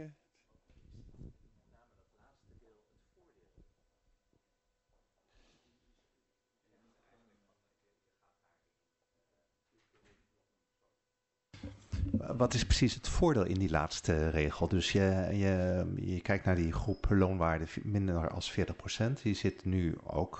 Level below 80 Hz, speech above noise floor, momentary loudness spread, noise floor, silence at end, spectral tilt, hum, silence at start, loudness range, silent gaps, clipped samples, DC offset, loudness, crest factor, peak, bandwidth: -46 dBFS; 54 dB; 7 LU; -85 dBFS; 0 s; -6 dB/octave; none; 0 s; 6 LU; none; under 0.1%; under 0.1%; -33 LUFS; 20 dB; -16 dBFS; 8.2 kHz